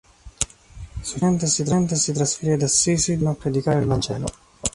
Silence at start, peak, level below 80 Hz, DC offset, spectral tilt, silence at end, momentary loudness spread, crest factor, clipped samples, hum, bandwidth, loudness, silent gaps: 0.25 s; -4 dBFS; -42 dBFS; under 0.1%; -4.5 dB/octave; 0.05 s; 11 LU; 18 dB; under 0.1%; none; 11.5 kHz; -21 LUFS; none